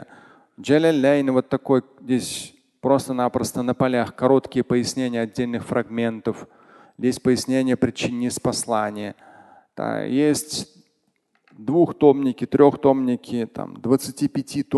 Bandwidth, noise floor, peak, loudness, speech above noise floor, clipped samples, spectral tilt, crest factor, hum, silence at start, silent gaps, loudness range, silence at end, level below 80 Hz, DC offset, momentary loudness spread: 12.5 kHz; -69 dBFS; -2 dBFS; -21 LUFS; 48 dB; under 0.1%; -5.5 dB/octave; 20 dB; none; 0 s; none; 4 LU; 0 s; -56 dBFS; under 0.1%; 13 LU